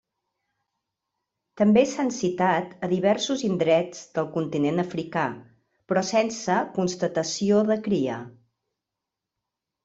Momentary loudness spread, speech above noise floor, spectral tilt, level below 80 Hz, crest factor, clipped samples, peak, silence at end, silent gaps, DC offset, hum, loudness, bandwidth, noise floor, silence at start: 8 LU; 62 dB; -5.5 dB/octave; -66 dBFS; 18 dB; under 0.1%; -8 dBFS; 1.55 s; none; under 0.1%; none; -24 LUFS; 8 kHz; -86 dBFS; 1.55 s